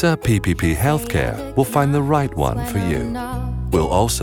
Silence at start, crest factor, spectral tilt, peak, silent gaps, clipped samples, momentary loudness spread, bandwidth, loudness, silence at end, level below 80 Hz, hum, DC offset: 0 s; 16 dB; -6 dB/octave; -4 dBFS; none; under 0.1%; 6 LU; 18.5 kHz; -20 LUFS; 0 s; -30 dBFS; none; under 0.1%